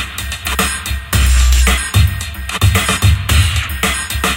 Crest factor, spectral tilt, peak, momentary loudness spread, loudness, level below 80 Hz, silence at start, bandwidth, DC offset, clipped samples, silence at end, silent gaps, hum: 14 dB; -3.5 dB/octave; 0 dBFS; 9 LU; -14 LUFS; -16 dBFS; 0 s; 17.5 kHz; under 0.1%; under 0.1%; 0 s; none; none